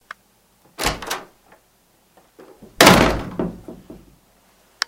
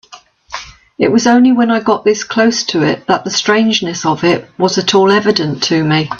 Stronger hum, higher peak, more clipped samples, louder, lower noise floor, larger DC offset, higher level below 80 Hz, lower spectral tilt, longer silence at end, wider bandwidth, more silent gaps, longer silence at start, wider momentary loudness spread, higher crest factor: neither; about the same, 0 dBFS vs 0 dBFS; neither; second, -17 LUFS vs -12 LUFS; first, -59 dBFS vs -40 dBFS; neither; first, -38 dBFS vs -52 dBFS; about the same, -3.5 dB/octave vs -4.5 dB/octave; first, 0.95 s vs 0 s; first, 17 kHz vs 7.6 kHz; neither; first, 0.8 s vs 0.1 s; first, 21 LU vs 7 LU; first, 22 dB vs 12 dB